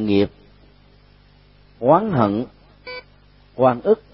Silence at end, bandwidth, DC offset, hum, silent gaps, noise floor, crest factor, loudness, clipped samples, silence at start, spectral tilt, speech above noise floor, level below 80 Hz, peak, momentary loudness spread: 0.15 s; 5.8 kHz; under 0.1%; 50 Hz at -50 dBFS; none; -51 dBFS; 20 dB; -19 LUFS; under 0.1%; 0 s; -12 dB/octave; 34 dB; -52 dBFS; -2 dBFS; 20 LU